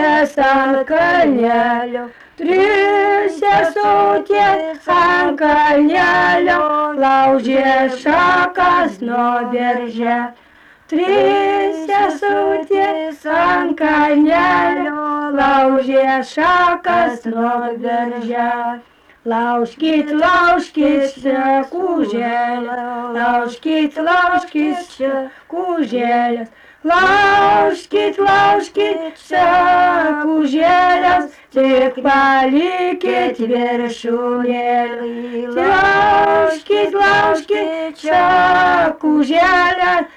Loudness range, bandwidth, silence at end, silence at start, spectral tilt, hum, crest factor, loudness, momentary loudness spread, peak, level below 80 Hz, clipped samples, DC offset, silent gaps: 4 LU; 11 kHz; 0.1 s; 0 s; -5 dB/octave; none; 10 dB; -14 LUFS; 8 LU; -4 dBFS; -48 dBFS; under 0.1%; under 0.1%; none